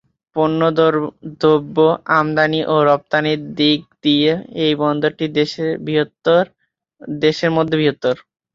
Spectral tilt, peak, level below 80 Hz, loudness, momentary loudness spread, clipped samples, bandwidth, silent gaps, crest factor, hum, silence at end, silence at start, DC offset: -6.5 dB/octave; -2 dBFS; -58 dBFS; -17 LUFS; 7 LU; under 0.1%; 7.4 kHz; none; 16 dB; none; 0.4 s; 0.35 s; under 0.1%